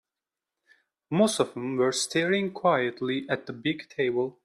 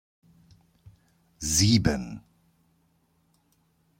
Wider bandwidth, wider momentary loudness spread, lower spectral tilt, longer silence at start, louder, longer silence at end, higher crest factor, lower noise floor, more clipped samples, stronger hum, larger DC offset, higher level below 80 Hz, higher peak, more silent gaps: second, 14 kHz vs 16.5 kHz; second, 7 LU vs 20 LU; about the same, -4 dB/octave vs -4 dB/octave; second, 1.1 s vs 1.4 s; second, -27 LUFS vs -24 LUFS; second, 0.15 s vs 1.8 s; second, 18 dB vs 24 dB; first, -89 dBFS vs -68 dBFS; neither; neither; neither; second, -70 dBFS vs -48 dBFS; second, -10 dBFS vs -6 dBFS; neither